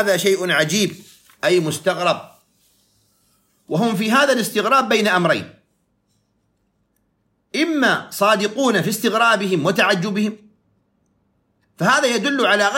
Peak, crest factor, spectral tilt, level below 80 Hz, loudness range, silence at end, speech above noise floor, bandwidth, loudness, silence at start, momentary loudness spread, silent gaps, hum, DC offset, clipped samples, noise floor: -2 dBFS; 18 dB; -4 dB/octave; -70 dBFS; 5 LU; 0 s; 49 dB; 16.5 kHz; -18 LUFS; 0 s; 7 LU; none; none; under 0.1%; under 0.1%; -67 dBFS